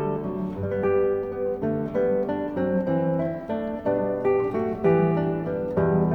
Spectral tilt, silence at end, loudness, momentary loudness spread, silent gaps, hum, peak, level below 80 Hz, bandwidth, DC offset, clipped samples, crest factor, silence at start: -10.5 dB/octave; 0 s; -25 LUFS; 6 LU; none; none; -10 dBFS; -50 dBFS; 4.4 kHz; under 0.1%; under 0.1%; 14 dB; 0 s